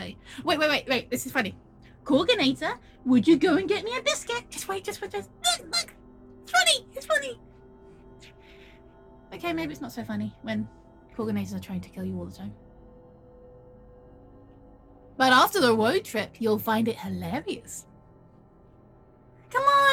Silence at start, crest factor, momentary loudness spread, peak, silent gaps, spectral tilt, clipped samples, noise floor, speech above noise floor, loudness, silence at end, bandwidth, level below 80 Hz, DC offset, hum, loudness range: 0 s; 22 dB; 17 LU; -6 dBFS; none; -3.5 dB/octave; under 0.1%; -55 dBFS; 28 dB; -26 LUFS; 0 s; 17.5 kHz; -58 dBFS; under 0.1%; none; 12 LU